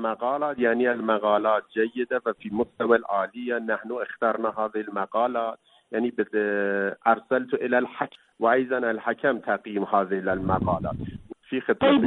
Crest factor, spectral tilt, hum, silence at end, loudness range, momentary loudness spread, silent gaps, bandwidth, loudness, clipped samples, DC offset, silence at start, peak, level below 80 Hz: 18 dB; -9 dB/octave; none; 0 s; 2 LU; 8 LU; none; 4.1 kHz; -25 LUFS; under 0.1%; under 0.1%; 0 s; -6 dBFS; -54 dBFS